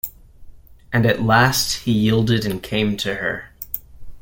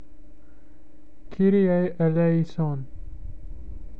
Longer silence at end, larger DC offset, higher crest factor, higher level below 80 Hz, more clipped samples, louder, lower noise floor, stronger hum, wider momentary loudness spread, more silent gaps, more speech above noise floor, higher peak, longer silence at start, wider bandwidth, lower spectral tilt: about the same, 0 s vs 0 s; second, under 0.1% vs 2%; about the same, 18 dB vs 16 dB; about the same, -42 dBFS vs -42 dBFS; neither; first, -19 LUFS vs -23 LUFS; second, -40 dBFS vs -53 dBFS; neither; second, 14 LU vs 23 LU; neither; second, 22 dB vs 31 dB; first, -2 dBFS vs -10 dBFS; about the same, 0.05 s vs 0.1 s; first, 17 kHz vs 5.2 kHz; second, -5 dB/octave vs -10.5 dB/octave